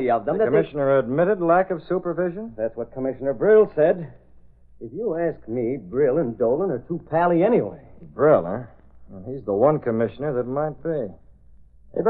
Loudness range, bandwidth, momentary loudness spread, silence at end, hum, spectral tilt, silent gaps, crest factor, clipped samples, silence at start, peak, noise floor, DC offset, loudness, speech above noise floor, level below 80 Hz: 4 LU; 4.2 kHz; 14 LU; 0 s; none; -12 dB/octave; none; 18 dB; under 0.1%; 0 s; -4 dBFS; -49 dBFS; under 0.1%; -22 LUFS; 28 dB; -54 dBFS